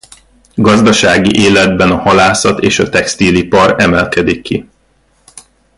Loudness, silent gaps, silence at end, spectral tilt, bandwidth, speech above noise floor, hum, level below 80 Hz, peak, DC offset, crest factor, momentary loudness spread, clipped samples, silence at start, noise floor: -9 LUFS; none; 0.4 s; -4.5 dB/octave; 11.5 kHz; 44 dB; none; -34 dBFS; 0 dBFS; under 0.1%; 10 dB; 7 LU; under 0.1%; 0.55 s; -53 dBFS